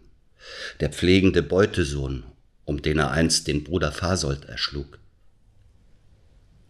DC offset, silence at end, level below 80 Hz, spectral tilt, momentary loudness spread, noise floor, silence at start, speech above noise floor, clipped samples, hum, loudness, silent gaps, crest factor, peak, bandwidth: under 0.1%; 1.85 s; -38 dBFS; -4.5 dB/octave; 17 LU; -55 dBFS; 0.45 s; 32 dB; under 0.1%; none; -23 LUFS; none; 20 dB; -4 dBFS; 13.5 kHz